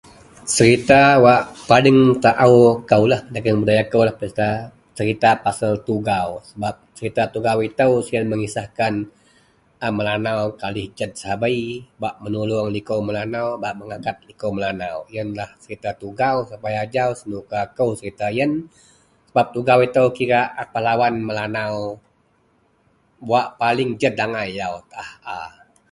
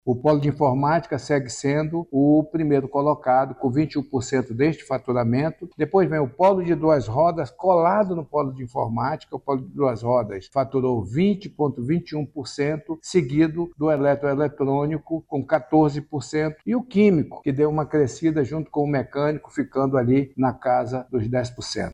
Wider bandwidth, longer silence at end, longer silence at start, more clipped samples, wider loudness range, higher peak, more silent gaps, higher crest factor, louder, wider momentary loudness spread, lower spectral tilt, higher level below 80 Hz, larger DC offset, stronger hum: first, 11.5 kHz vs 10 kHz; first, 0.4 s vs 0 s; first, 0.45 s vs 0.05 s; neither; first, 10 LU vs 3 LU; first, 0 dBFS vs -6 dBFS; neither; about the same, 20 dB vs 16 dB; first, -19 LUFS vs -22 LUFS; first, 16 LU vs 8 LU; second, -5.5 dB/octave vs -7.5 dB/octave; about the same, -52 dBFS vs -52 dBFS; neither; neither